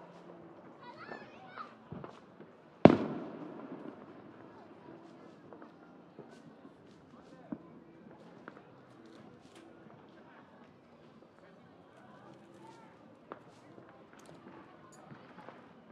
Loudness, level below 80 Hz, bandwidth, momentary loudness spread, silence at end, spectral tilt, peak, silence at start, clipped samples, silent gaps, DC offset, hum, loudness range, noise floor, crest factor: -33 LUFS; -72 dBFS; 10 kHz; 11 LU; 0.3 s; -8.5 dB/octave; -2 dBFS; 0 s; under 0.1%; none; under 0.1%; none; 24 LU; -59 dBFS; 38 dB